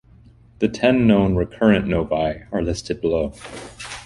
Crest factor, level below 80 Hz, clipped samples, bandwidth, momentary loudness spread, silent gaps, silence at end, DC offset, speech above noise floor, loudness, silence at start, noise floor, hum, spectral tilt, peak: 18 dB; -38 dBFS; under 0.1%; 11.5 kHz; 16 LU; none; 0 s; under 0.1%; 29 dB; -20 LUFS; 0.6 s; -49 dBFS; none; -6.5 dB/octave; -2 dBFS